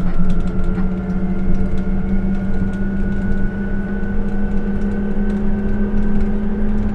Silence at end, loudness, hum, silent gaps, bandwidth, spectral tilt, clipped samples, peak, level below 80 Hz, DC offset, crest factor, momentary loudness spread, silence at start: 0 s; -21 LUFS; none; none; 3.4 kHz; -9.5 dB/octave; under 0.1%; -2 dBFS; -18 dBFS; under 0.1%; 12 dB; 2 LU; 0 s